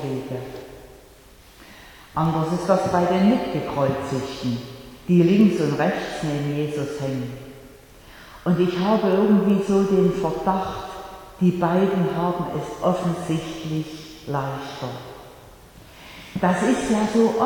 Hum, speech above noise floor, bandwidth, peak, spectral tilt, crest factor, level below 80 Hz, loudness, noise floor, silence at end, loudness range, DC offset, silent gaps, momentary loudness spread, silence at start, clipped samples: none; 27 dB; 18.5 kHz; -4 dBFS; -7 dB/octave; 18 dB; -50 dBFS; -22 LUFS; -48 dBFS; 0 s; 6 LU; under 0.1%; none; 18 LU; 0 s; under 0.1%